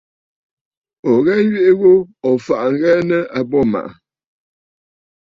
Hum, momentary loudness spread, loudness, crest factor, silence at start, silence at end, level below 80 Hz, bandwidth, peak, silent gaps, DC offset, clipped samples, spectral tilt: none; 7 LU; -15 LUFS; 14 dB; 1.05 s; 1.5 s; -56 dBFS; 7.2 kHz; -2 dBFS; none; under 0.1%; under 0.1%; -8 dB/octave